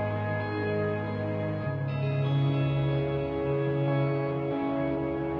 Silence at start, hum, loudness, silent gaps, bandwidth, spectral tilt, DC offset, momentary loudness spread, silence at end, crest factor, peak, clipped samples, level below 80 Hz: 0 s; none; -29 LUFS; none; 4.9 kHz; -10 dB/octave; under 0.1%; 4 LU; 0 s; 12 dB; -16 dBFS; under 0.1%; -52 dBFS